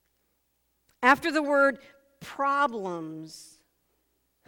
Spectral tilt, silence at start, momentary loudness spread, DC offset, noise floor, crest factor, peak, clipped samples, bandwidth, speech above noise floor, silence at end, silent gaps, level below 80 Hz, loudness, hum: -4 dB/octave; 1 s; 22 LU; under 0.1%; -74 dBFS; 24 dB; -6 dBFS; under 0.1%; 18.5 kHz; 48 dB; 1.05 s; none; -70 dBFS; -25 LUFS; none